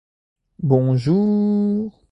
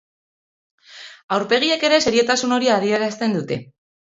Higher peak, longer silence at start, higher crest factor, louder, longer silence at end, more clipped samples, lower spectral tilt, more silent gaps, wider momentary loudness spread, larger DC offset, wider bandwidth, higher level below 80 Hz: about the same, -2 dBFS vs -4 dBFS; second, 0.6 s vs 0.9 s; about the same, 16 dB vs 18 dB; about the same, -19 LUFS vs -18 LUFS; second, 0.2 s vs 0.5 s; neither; first, -10.5 dB/octave vs -3.5 dB/octave; second, none vs 1.24-1.28 s; second, 7 LU vs 15 LU; neither; second, 6 kHz vs 8 kHz; about the same, -56 dBFS vs -60 dBFS